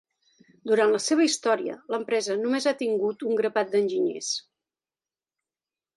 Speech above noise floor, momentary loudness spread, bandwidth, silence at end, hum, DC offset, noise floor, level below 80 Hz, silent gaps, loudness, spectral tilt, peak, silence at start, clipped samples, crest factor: over 65 dB; 8 LU; 11.5 kHz; 1.55 s; none; under 0.1%; under -90 dBFS; -80 dBFS; none; -25 LUFS; -3 dB/octave; -8 dBFS; 0.65 s; under 0.1%; 18 dB